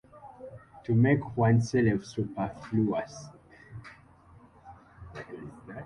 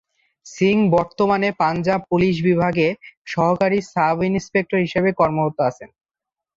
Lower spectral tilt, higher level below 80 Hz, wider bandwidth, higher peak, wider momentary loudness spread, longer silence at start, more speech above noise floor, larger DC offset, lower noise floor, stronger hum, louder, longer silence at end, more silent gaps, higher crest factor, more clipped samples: about the same, -8 dB/octave vs -7 dB/octave; about the same, -56 dBFS vs -52 dBFS; first, 10.5 kHz vs 7.8 kHz; second, -12 dBFS vs -4 dBFS; first, 23 LU vs 4 LU; second, 0.15 s vs 0.45 s; second, 29 dB vs 68 dB; neither; second, -56 dBFS vs -87 dBFS; neither; second, -28 LUFS vs -19 LUFS; second, 0 s vs 0.7 s; second, none vs 3.17-3.25 s; about the same, 18 dB vs 14 dB; neither